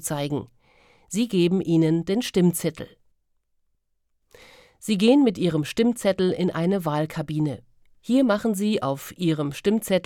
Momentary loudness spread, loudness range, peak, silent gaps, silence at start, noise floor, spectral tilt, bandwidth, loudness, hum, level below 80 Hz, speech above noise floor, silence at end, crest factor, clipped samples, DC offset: 10 LU; 3 LU; -6 dBFS; none; 0 s; -71 dBFS; -6 dB/octave; 17.5 kHz; -23 LUFS; none; -58 dBFS; 49 dB; 0.05 s; 18 dB; under 0.1%; under 0.1%